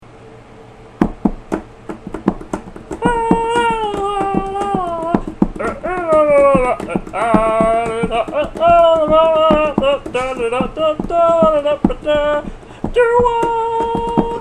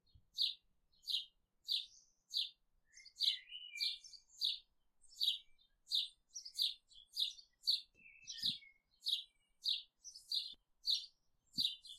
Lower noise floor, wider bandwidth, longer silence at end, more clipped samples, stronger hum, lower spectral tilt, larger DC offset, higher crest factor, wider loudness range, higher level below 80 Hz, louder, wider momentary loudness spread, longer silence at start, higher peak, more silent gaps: second, -39 dBFS vs -73 dBFS; second, 10.5 kHz vs 15.5 kHz; about the same, 0 s vs 0 s; neither; neither; first, -6.5 dB/octave vs 2 dB/octave; first, 0.1% vs under 0.1%; about the same, 16 dB vs 20 dB; first, 6 LU vs 2 LU; first, -32 dBFS vs -82 dBFS; first, -15 LUFS vs -40 LUFS; second, 11 LU vs 18 LU; second, 0.15 s vs 0.35 s; first, 0 dBFS vs -24 dBFS; neither